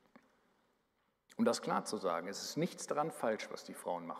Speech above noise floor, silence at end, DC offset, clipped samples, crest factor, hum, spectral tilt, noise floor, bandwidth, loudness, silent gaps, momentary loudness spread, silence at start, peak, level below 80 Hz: 42 dB; 0 s; under 0.1%; under 0.1%; 20 dB; none; -4.5 dB/octave; -80 dBFS; 15.5 kHz; -38 LUFS; none; 8 LU; 1.3 s; -20 dBFS; -88 dBFS